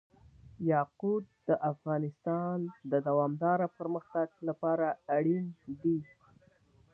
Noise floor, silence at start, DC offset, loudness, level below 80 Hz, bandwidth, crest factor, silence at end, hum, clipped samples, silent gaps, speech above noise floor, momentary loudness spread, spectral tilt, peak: -65 dBFS; 0.45 s; under 0.1%; -33 LUFS; -72 dBFS; 3.3 kHz; 16 dB; 0.9 s; none; under 0.1%; none; 33 dB; 6 LU; -11.5 dB/octave; -16 dBFS